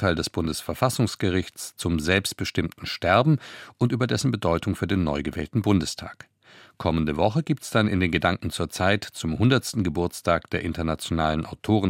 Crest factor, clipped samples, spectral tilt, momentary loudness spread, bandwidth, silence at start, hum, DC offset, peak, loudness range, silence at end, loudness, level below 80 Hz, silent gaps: 20 dB; under 0.1%; -5.5 dB/octave; 8 LU; 16.5 kHz; 0 s; none; under 0.1%; -4 dBFS; 2 LU; 0 s; -25 LUFS; -48 dBFS; none